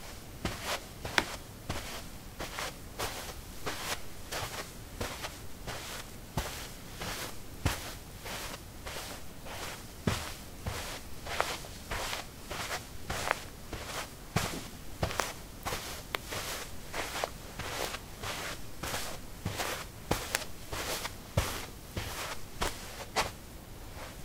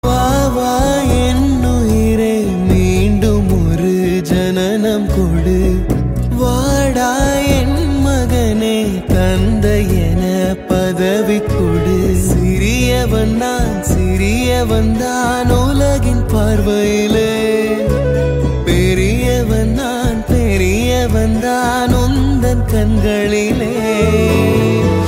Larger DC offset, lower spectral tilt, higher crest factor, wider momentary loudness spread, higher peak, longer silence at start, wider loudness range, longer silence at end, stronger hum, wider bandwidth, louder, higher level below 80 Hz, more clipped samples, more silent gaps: neither; second, -3 dB/octave vs -6 dB/octave; first, 36 dB vs 12 dB; first, 9 LU vs 3 LU; about the same, -2 dBFS vs 0 dBFS; about the same, 0 s vs 0.05 s; about the same, 3 LU vs 1 LU; about the same, 0 s vs 0 s; neither; about the same, 16 kHz vs 16.5 kHz; second, -38 LUFS vs -14 LUFS; second, -48 dBFS vs -20 dBFS; neither; neither